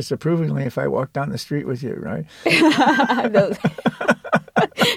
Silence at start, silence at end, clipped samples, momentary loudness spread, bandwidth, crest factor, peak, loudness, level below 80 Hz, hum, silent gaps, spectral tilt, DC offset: 0 s; 0 s; under 0.1%; 11 LU; 16 kHz; 16 dB; -2 dBFS; -19 LUFS; -56 dBFS; none; none; -5.5 dB/octave; under 0.1%